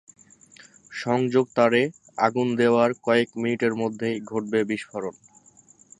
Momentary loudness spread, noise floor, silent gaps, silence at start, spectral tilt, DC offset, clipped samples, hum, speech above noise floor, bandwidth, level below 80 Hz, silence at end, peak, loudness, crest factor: 11 LU; -55 dBFS; none; 0.9 s; -6 dB/octave; under 0.1%; under 0.1%; none; 32 dB; 10.5 kHz; -68 dBFS; 0.9 s; -4 dBFS; -24 LUFS; 20 dB